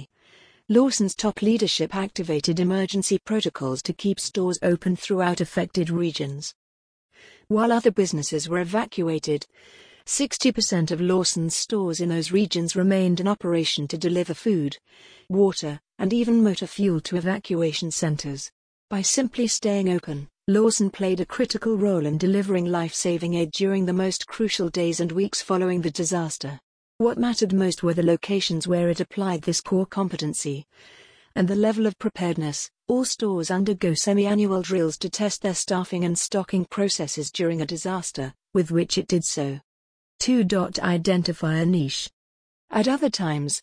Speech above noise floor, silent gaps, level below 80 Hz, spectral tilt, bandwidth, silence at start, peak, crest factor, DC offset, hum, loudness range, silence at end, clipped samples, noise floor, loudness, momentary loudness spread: 33 dB; 6.55-7.09 s, 18.52-18.88 s, 26.63-26.99 s, 39.64-40.19 s, 42.13-42.68 s; -58 dBFS; -4.5 dB/octave; 10.5 kHz; 0 s; -6 dBFS; 18 dB; under 0.1%; none; 2 LU; 0.05 s; under 0.1%; -56 dBFS; -24 LUFS; 7 LU